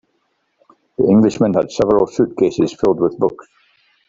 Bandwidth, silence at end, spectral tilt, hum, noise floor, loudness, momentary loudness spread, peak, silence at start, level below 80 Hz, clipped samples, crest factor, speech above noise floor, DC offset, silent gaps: 7.8 kHz; 0.65 s; -7.5 dB/octave; none; -66 dBFS; -16 LUFS; 7 LU; -2 dBFS; 1 s; -50 dBFS; under 0.1%; 14 dB; 51 dB; under 0.1%; none